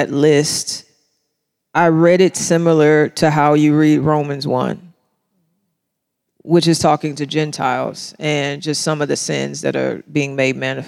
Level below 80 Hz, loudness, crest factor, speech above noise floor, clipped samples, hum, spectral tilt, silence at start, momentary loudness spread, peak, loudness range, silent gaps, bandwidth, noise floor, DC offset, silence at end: -58 dBFS; -16 LUFS; 16 dB; 60 dB; under 0.1%; none; -5 dB/octave; 0 s; 9 LU; -2 dBFS; 6 LU; none; 15.5 kHz; -75 dBFS; under 0.1%; 0 s